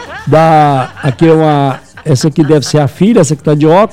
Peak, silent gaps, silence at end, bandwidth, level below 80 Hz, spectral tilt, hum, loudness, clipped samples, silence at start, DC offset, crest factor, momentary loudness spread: 0 dBFS; none; 0 s; 13.5 kHz; -42 dBFS; -6.5 dB/octave; none; -9 LUFS; 2%; 0 s; under 0.1%; 8 dB; 7 LU